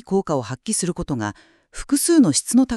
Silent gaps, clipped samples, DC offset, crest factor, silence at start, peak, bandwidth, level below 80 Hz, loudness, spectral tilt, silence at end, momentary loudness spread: none; under 0.1%; under 0.1%; 16 dB; 0.05 s; -4 dBFS; 13.5 kHz; -44 dBFS; -20 LUFS; -4.5 dB/octave; 0 s; 14 LU